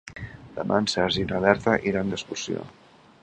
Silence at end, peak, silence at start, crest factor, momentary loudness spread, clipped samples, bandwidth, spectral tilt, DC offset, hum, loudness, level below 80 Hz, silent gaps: 0.5 s; -2 dBFS; 0.05 s; 24 dB; 17 LU; under 0.1%; 9.8 kHz; -4.5 dB/octave; under 0.1%; none; -25 LUFS; -50 dBFS; none